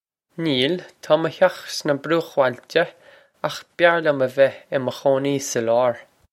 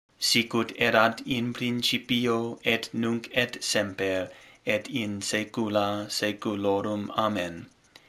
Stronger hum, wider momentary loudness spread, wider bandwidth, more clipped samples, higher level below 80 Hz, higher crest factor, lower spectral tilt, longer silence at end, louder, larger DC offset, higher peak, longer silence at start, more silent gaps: neither; first, 11 LU vs 7 LU; second, 14.5 kHz vs 16 kHz; neither; second, -70 dBFS vs -64 dBFS; about the same, 20 dB vs 22 dB; about the same, -4.5 dB/octave vs -3.5 dB/octave; about the same, 0.3 s vs 0.4 s; first, -21 LUFS vs -27 LUFS; neither; first, 0 dBFS vs -6 dBFS; first, 0.4 s vs 0.2 s; neither